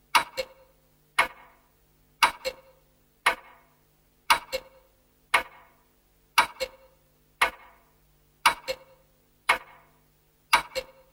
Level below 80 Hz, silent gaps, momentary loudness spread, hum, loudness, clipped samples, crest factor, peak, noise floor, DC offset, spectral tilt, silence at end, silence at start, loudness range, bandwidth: -60 dBFS; none; 12 LU; none; -27 LUFS; under 0.1%; 28 dB; -2 dBFS; -64 dBFS; under 0.1%; 0 dB/octave; 0.3 s; 0.15 s; 2 LU; 16.5 kHz